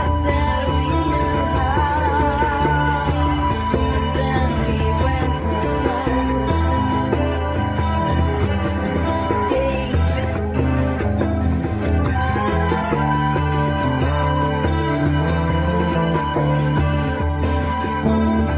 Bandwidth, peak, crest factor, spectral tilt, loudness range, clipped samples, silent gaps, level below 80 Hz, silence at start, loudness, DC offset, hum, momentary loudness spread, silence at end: 4 kHz; -4 dBFS; 14 dB; -11.5 dB/octave; 1 LU; under 0.1%; none; -24 dBFS; 0 s; -19 LUFS; under 0.1%; none; 2 LU; 0 s